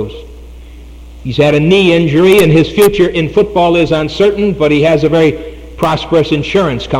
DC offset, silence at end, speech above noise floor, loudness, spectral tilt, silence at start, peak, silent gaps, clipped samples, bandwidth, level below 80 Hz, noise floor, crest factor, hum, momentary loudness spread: under 0.1%; 0 s; 21 dB; -10 LUFS; -6.5 dB/octave; 0 s; 0 dBFS; none; under 0.1%; 16.5 kHz; -32 dBFS; -31 dBFS; 10 dB; none; 10 LU